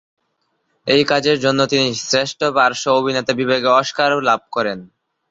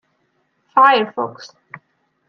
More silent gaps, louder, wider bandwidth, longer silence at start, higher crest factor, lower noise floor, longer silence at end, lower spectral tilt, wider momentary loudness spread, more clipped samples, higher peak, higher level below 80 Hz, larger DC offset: neither; about the same, -16 LUFS vs -15 LUFS; first, 8 kHz vs 6.6 kHz; about the same, 0.85 s vs 0.75 s; about the same, 16 dB vs 18 dB; about the same, -69 dBFS vs -66 dBFS; second, 0.45 s vs 0.85 s; about the same, -3.5 dB/octave vs -4.5 dB/octave; second, 7 LU vs 16 LU; neither; about the same, -2 dBFS vs -2 dBFS; first, -60 dBFS vs -76 dBFS; neither